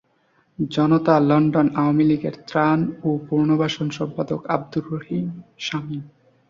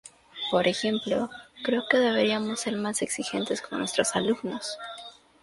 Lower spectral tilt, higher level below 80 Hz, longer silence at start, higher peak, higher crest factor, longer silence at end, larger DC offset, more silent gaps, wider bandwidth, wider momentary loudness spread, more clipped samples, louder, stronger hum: first, -7.5 dB/octave vs -3.5 dB/octave; first, -58 dBFS vs -66 dBFS; first, 0.6 s vs 0.05 s; about the same, -4 dBFS vs -6 dBFS; about the same, 18 dB vs 22 dB; about the same, 0.4 s vs 0.3 s; neither; neither; second, 7.4 kHz vs 11.5 kHz; about the same, 12 LU vs 13 LU; neither; first, -21 LUFS vs -27 LUFS; neither